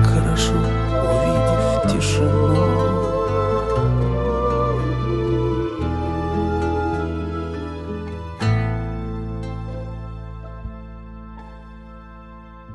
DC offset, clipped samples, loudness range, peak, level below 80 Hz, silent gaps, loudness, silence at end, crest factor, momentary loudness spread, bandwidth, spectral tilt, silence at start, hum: under 0.1%; under 0.1%; 13 LU; -6 dBFS; -30 dBFS; none; -21 LUFS; 0 s; 16 dB; 20 LU; 11.5 kHz; -6.5 dB/octave; 0 s; none